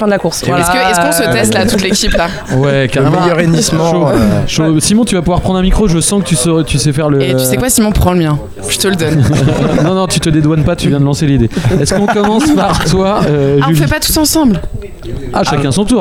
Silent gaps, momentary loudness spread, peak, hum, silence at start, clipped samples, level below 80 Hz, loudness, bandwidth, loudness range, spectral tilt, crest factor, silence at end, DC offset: none; 3 LU; 0 dBFS; none; 0 s; under 0.1%; -24 dBFS; -10 LUFS; 16.5 kHz; 1 LU; -5 dB/octave; 10 dB; 0 s; under 0.1%